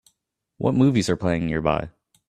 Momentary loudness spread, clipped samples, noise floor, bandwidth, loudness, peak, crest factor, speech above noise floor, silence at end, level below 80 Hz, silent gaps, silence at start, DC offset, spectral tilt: 8 LU; under 0.1%; -75 dBFS; 12 kHz; -22 LUFS; -4 dBFS; 18 dB; 54 dB; 0.4 s; -46 dBFS; none; 0.6 s; under 0.1%; -6.5 dB/octave